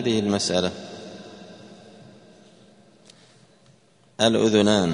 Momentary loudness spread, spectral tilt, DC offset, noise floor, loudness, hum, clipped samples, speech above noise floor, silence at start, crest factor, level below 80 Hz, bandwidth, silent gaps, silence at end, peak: 26 LU; -4.5 dB/octave; under 0.1%; -57 dBFS; -21 LUFS; none; under 0.1%; 37 dB; 0 s; 22 dB; -60 dBFS; 10.5 kHz; none; 0 s; -4 dBFS